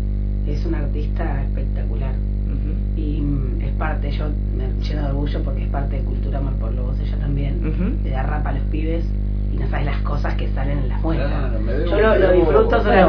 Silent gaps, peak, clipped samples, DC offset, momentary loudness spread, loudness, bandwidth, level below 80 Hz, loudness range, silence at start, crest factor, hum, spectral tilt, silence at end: none; -2 dBFS; under 0.1%; under 0.1%; 8 LU; -22 LUFS; 5.4 kHz; -22 dBFS; 4 LU; 0 s; 18 dB; 50 Hz at -20 dBFS; -9.5 dB/octave; 0 s